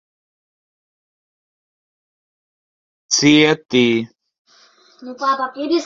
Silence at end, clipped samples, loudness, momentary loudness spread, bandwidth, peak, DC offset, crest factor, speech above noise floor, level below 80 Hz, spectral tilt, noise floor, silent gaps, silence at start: 0 s; under 0.1%; -16 LUFS; 12 LU; 7.8 kHz; 0 dBFS; under 0.1%; 20 dB; 36 dB; -62 dBFS; -3.5 dB/octave; -52 dBFS; 4.39-4.45 s; 3.1 s